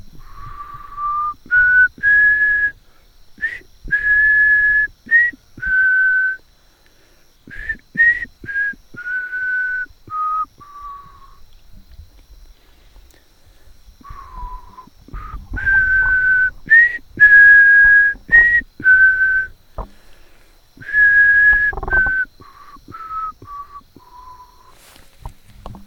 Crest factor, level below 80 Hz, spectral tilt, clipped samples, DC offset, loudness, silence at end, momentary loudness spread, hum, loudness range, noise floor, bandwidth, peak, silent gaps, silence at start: 18 dB; -38 dBFS; -4.5 dB/octave; under 0.1%; under 0.1%; -12 LUFS; 0.1 s; 25 LU; none; 15 LU; -51 dBFS; 6.6 kHz; 0 dBFS; none; 0.15 s